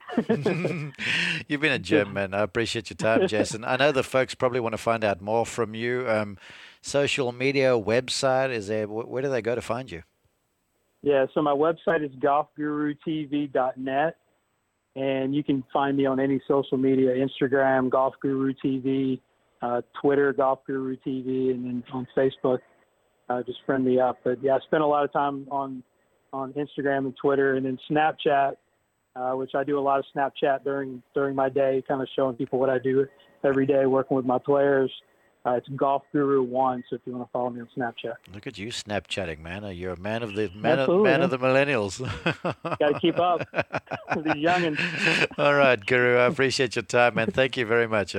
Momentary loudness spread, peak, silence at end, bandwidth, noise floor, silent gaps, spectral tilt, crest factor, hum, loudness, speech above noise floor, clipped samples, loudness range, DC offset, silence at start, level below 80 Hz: 10 LU; -4 dBFS; 0 s; 12 kHz; -73 dBFS; none; -5.5 dB/octave; 20 dB; none; -25 LUFS; 49 dB; under 0.1%; 5 LU; under 0.1%; 0.05 s; -62 dBFS